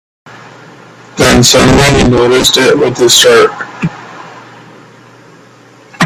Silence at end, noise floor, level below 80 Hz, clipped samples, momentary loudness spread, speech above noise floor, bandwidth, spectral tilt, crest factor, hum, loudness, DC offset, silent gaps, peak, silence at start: 0 s; -39 dBFS; -30 dBFS; 0.4%; 20 LU; 32 dB; over 20 kHz; -3.5 dB/octave; 10 dB; none; -7 LUFS; under 0.1%; none; 0 dBFS; 1.15 s